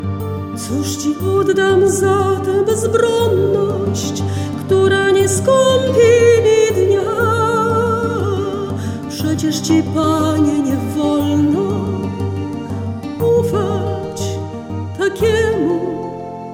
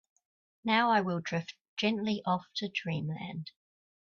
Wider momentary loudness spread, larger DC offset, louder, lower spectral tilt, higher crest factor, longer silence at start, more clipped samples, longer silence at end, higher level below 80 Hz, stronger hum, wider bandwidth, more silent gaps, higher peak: second, 11 LU vs 14 LU; neither; first, -16 LUFS vs -32 LUFS; about the same, -5.5 dB/octave vs -5.5 dB/octave; second, 14 dB vs 20 dB; second, 0 s vs 0.65 s; neither; second, 0 s vs 0.6 s; first, -44 dBFS vs -74 dBFS; neither; first, 17 kHz vs 7.2 kHz; second, none vs 1.61-1.77 s; first, -2 dBFS vs -14 dBFS